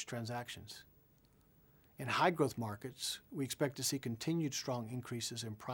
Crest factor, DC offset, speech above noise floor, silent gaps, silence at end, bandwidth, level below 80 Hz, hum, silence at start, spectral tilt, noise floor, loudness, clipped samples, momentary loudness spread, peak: 24 dB; under 0.1%; 30 dB; none; 0 s; over 20 kHz; -74 dBFS; none; 0 s; -4 dB/octave; -69 dBFS; -39 LUFS; under 0.1%; 13 LU; -16 dBFS